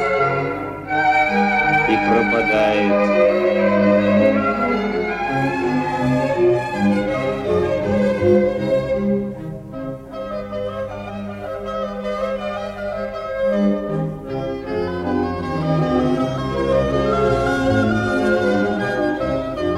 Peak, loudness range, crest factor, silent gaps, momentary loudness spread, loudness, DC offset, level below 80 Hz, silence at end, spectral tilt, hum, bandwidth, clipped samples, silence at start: -4 dBFS; 9 LU; 16 dB; none; 11 LU; -19 LUFS; under 0.1%; -40 dBFS; 0 s; -7 dB/octave; 50 Hz at -40 dBFS; 11.5 kHz; under 0.1%; 0 s